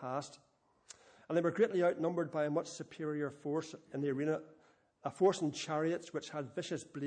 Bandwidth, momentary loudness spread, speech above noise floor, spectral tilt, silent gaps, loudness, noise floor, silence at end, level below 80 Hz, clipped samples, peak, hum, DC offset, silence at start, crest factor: 9.8 kHz; 14 LU; 30 dB; -5.5 dB/octave; none; -37 LUFS; -66 dBFS; 0 s; -84 dBFS; under 0.1%; -18 dBFS; none; under 0.1%; 0 s; 18 dB